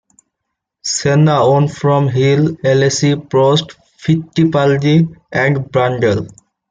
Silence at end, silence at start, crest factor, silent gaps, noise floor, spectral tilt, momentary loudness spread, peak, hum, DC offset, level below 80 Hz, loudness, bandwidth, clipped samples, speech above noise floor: 0.4 s; 0.85 s; 12 dB; none; -77 dBFS; -6 dB/octave; 7 LU; -2 dBFS; none; under 0.1%; -50 dBFS; -14 LUFS; 9.4 kHz; under 0.1%; 64 dB